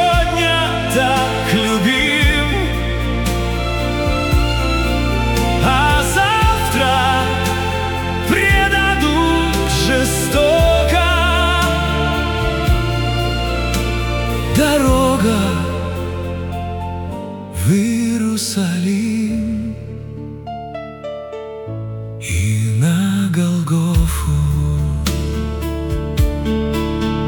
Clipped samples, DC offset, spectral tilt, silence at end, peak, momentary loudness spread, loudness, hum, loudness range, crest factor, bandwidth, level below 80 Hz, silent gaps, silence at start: under 0.1%; under 0.1%; -5 dB/octave; 0 s; -2 dBFS; 12 LU; -16 LUFS; none; 6 LU; 14 dB; 18 kHz; -24 dBFS; none; 0 s